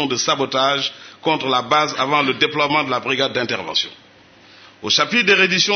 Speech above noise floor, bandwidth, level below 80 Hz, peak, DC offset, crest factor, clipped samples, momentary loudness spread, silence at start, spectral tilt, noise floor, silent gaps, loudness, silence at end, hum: 29 dB; 6.6 kHz; -64 dBFS; -2 dBFS; under 0.1%; 18 dB; under 0.1%; 8 LU; 0 s; -2.5 dB/octave; -47 dBFS; none; -17 LUFS; 0 s; none